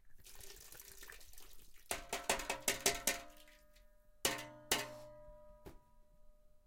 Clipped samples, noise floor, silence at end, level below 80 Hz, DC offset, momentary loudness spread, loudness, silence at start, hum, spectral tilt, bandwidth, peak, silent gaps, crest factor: under 0.1%; -64 dBFS; 0.1 s; -60 dBFS; under 0.1%; 25 LU; -39 LUFS; 0.05 s; none; -0.5 dB/octave; 17 kHz; -18 dBFS; none; 28 dB